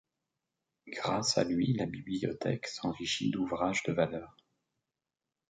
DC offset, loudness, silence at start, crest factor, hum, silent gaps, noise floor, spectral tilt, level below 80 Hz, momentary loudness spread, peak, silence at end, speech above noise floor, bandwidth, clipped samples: under 0.1%; -33 LUFS; 0.85 s; 22 dB; none; none; under -90 dBFS; -4.5 dB/octave; -64 dBFS; 7 LU; -14 dBFS; 1.2 s; over 57 dB; 9.4 kHz; under 0.1%